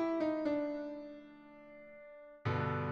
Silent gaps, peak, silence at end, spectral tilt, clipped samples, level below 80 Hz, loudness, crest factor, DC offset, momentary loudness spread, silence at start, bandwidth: none; -22 dBFS; 0 s; -8.5 dB/octave; under 0.1%; -70 dBFS; -37 LUFS; 16 dB; under 0.1%; 20 LU; 0 s; 6.8 kHz